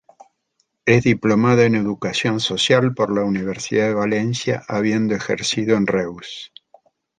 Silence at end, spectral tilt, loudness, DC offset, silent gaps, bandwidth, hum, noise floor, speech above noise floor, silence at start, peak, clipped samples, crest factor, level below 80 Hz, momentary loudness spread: 0.75 s; -5 dB/octave; -19 LUFS; under 0.1%; none; 9.6 kHz; none; -69 dBFS; 51 dB; 0.85 s; -2 dBFS; under 0.1%; 18 dB; -54 dBFS; 8 LU